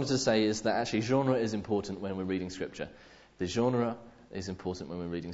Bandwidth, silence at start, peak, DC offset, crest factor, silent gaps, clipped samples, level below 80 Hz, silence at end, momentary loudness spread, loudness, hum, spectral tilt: 8 kHz; 0 s; -14 dBFS; under 0.1%; 18 dB; none; under 0.1%; -60 dBFS; 0 s; 13 LU; -32 LUFS; none; -5.5 dB/octave